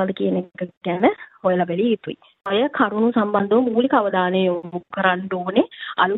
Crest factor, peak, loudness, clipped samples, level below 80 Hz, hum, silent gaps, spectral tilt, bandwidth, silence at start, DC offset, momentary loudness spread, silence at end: 18 dB; -2 dBFS; -20 LUFS; under 0.1%; -66 dBFS; none; 0.77-0.81 s; -9.5 dB/octave; 4.1 kHz; 0 s; under 0.1%; 8 LU; 0 s